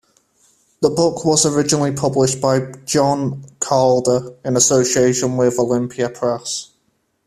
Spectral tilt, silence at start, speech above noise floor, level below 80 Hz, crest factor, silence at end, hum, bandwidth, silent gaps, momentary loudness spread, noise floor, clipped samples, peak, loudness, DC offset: -4.5 dB/octave; 0.8 s; 49 dB; -54 dBFS; 18 dB; 0.6 s; none; 14.5 kHz; none; 8 LU; -66 dBFS; under 0.1%; 0 dBFS; -17 LUFS; under 0.1%